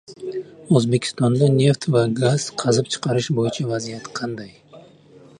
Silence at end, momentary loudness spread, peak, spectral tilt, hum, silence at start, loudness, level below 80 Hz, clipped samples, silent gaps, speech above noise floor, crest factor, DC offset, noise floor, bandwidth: 0.6 s; 14 LU; -2 dBFS; -6 dB/octave; none; 0.1 s; -20 LUFS; -60 dBFS; under 0.1%; none; 28 dB; 18 dB; under 0.1%; -48 dBFS; 11 kHz